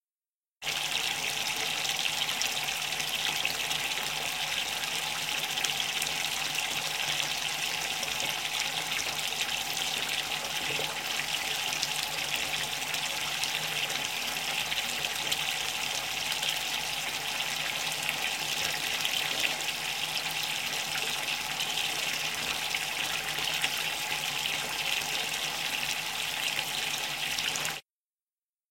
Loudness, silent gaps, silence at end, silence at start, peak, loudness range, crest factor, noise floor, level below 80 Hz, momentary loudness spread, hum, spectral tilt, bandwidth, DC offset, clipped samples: -29 LUFS; none; 0.9 s; 0.6 s; -6 dBFS; 1 LU; 26 dB; under -90 dBFS; -64 dBFS; 2 LU; none; 0 dB/octave; 17 kHz; under 0.1%; under 0.1%